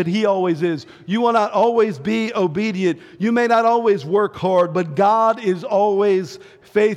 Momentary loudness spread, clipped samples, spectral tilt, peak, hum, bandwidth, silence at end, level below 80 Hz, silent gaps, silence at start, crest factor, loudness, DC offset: 7 LU; under 0.1%; -6.5 dB/octave; -6 dBFS; none; 10.5 kHz; 0 s; -64 dBFS; none; 0 s; 12 dB; -18 LUFS; under 0.1%